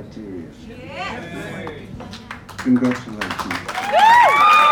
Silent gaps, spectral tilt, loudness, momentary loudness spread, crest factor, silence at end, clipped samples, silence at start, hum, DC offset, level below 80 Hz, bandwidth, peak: none; -4 dB/octave; -16 LUFS; 24 LU; 16 dB; 0 s; under 0.1%; 0 s; none; under 0.1%; -48 dBFS; 19.5 kHz; -2 dBFS